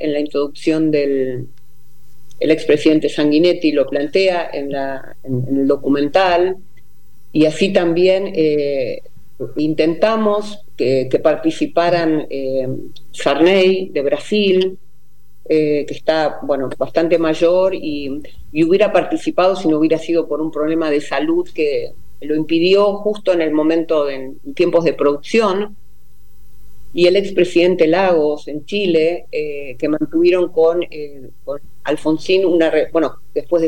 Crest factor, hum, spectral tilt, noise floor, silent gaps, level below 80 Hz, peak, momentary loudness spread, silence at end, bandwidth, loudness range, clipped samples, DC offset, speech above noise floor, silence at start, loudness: 16 dB; none; -6 dB/octave; -55 dBFS; none; -52 dBFS; -2 dBFS; 12 LU; 0 s; 17 kHz; 2 LU; under 0.1%; 4%; 39 dB; 0 s; -16 LUFS